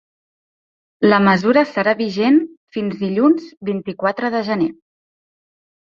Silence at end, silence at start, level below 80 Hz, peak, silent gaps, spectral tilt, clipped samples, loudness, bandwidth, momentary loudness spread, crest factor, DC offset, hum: 1.2 s; 1 s; -60 dBFS; -2 dBFS; 2.57-2.68 s; -7.5 dB/octave; under 0.1%; -17 LUFS; 7.2 kHz; 11 LU; 18 dB; under 0.1%; none